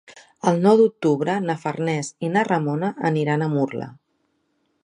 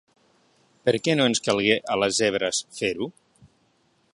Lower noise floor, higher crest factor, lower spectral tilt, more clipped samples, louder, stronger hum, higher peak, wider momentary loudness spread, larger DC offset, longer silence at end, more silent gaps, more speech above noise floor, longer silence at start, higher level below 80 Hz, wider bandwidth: first, -70 dBFS vs -66 dBFS; about the same, 20 dB vs 24 dB; first, -6.5 dB/octave vs -3.5 dB/octave; neither; about the same, -21 LUFS vs -23 LUFS; neither; about the same, -2 dBFS vs -2 dBFS; about the same, 9 LU vs 7 LU; neither; second, 0.9 s vs 1.05 s; neither; first, 49 dB vs 42 dB; second, 0.1 s vs 0.85 s; second, -70 dBFS vs -62 dBFS; about the same, 10.5 kHz vs 11.5 kHz